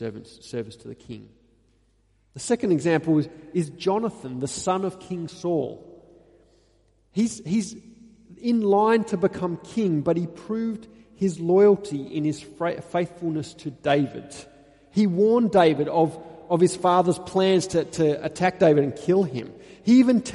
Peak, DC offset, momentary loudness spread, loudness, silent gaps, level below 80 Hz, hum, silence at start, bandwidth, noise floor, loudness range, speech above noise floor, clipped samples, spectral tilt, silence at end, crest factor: -6 dBFS; under 0.1%; 17 LU; -23 LUFS; none; -60 dBFS; none; 0 s; 11.5 kHz; -64 dBFS; 8 LU; 41 dB; under 0.1%; -6 dB/octave; 0 s; 18 dB